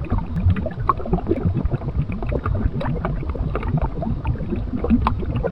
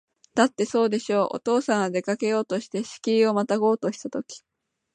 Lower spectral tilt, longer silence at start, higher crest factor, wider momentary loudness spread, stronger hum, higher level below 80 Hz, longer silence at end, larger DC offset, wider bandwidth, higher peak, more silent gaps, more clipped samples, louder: first, -10.5 dB/octave vs -5 dB/octave; second, 0 s vs 0.35 s; about the same, 20 dB vs 20 dB; second, 5 LU vs 11 LU; neither; first, -26 dBFS vs -74 dBFS; second, 0 s vs 0.55 s; neither; second, 5.4 kHz vs 9.6 kHz; about the same, -2 dBFS vs -4 dBFS; neither; neither; about the same, -23 LUFS vs -24 LUFS